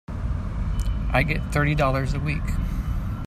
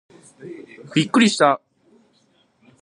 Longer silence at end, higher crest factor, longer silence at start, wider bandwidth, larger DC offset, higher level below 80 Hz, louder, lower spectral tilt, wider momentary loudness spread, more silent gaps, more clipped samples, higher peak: second, 0 s vs 1.25 s; second, 16 dB vs 22 dB; second, 0.1 s vs 0.4 s; first, 14 kHz vs 11 kHz; neither; first, -28 dBFS vs -72 dBFS; second, -25 LUFS vs -18 LUFS; first, -7 dB/octave vs -4.5 dB/octave; second, 8 LU vs 24 LU; neither; neither; second, -6 dBFS vs -2 dBFS